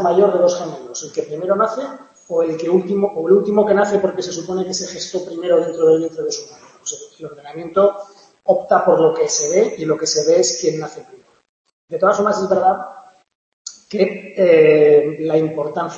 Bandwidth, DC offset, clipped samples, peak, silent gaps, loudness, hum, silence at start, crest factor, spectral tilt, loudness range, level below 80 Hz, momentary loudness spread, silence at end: 8.2 kHz; under 0.1%; under 0.1%; -2 dBFS; 11.49-11.65 s, 11.73-11.88 s, 13.35-13.65 s; -17 LUFS; none; 0 s; 16 dB; -4 dB/octave; 4 LU; -66 dBFS; 15 LU; 0 s